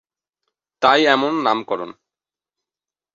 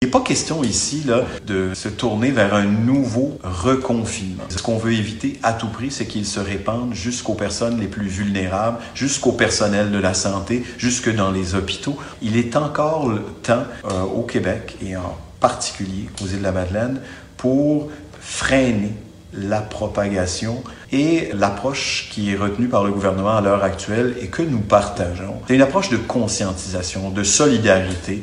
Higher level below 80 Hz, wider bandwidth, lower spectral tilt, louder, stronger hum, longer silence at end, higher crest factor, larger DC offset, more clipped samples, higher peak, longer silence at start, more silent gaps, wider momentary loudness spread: second, -66 dBFS vs -42 dBFS; second, 7.6 kHz vs 11.5 kHz; about the same, -4 dB/octave vs -4.5 dB/octave; first, -17 LUFS vs -20 LUFS; neither; first, 1.25 s vs 0 s; about the same, 20 dB vs 20 dB; neither; neither; about the same, -2 dBFS vs 0 dBFS; first, 0.8 s vs 0 s; neither; first, 13 LU vs 9 LU